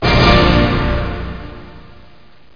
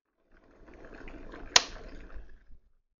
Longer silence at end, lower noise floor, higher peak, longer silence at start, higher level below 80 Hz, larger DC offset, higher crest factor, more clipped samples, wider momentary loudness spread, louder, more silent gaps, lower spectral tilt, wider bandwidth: first, 0.75 s vs 0.4 s; second, -47 dBFS vs -62 dBFS; first, 0 dBFS vs -4 dBFS; second, 0 s vs 0.35 s; first, -22 dBFS vs -50 dBFS; first, 1% vs under 0.1%; second, 16 dB vs 32 dB; neither; second, 20 LU vs 27 LU; first, -13 LUFS vs -26 LUFS; neither; first, -6.5 dB/octave vs 1 dB/octave; second, 5.2 kHz vs 7.4 kHz